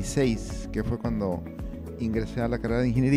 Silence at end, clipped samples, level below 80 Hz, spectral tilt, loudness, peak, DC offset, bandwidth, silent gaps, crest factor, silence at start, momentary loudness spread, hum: 0 s; under 0.1%; -38 dBFS; -7 dB/octave; -29 LUFS; -10 dBFS; under 0.1%; 15.5 kHz; none; 16 dB; 0 s; 10 LU; none